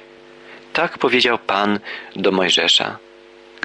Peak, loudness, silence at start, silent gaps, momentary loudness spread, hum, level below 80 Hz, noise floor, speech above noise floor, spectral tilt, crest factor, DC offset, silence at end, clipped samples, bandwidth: -4 dBFS; -17 LUFS; 0.45 s; none; 12 LU; none; -62 dBFS; -44 dBFS; 26 dB; -3 dB/octave; 16 dB; under 0.1%; 0.65 s; under 0.1%; 10.5 kHz